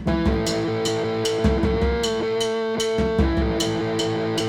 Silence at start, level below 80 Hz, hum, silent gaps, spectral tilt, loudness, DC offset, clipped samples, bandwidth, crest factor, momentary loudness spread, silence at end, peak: 0 s; -30 dBFS; none; none; -5 dB/octave; -22 LUFS; under 0.1%; under 0.1%; 16.5 kHz; 16 dB; 2 LU; 0 s; -6 dBFS